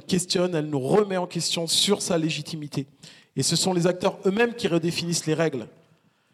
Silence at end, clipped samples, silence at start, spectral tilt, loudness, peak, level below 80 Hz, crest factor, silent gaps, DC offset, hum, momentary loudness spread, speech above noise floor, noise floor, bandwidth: 0.65 s; under 0.1%; 0.1 s; -4 dB/octave; -24 LUFS; -8 dBFS; -64 dBFS; 16 dB; none; under 0.1%; none; 11 LU; 38 dB; -62 dBFS; 15.5 kHz